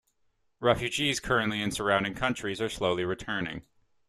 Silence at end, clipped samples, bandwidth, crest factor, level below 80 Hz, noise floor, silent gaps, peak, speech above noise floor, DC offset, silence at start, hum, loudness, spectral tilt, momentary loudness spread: 0.45 s; under 0.1%; 14 kHz; 22 dB; -54 dBFS; -71 dBFS; none; -8 dBFS; 42 dB; under 0.1%; 0.6 s; none; -29 LUFS; -4 dB/octave; 6 LU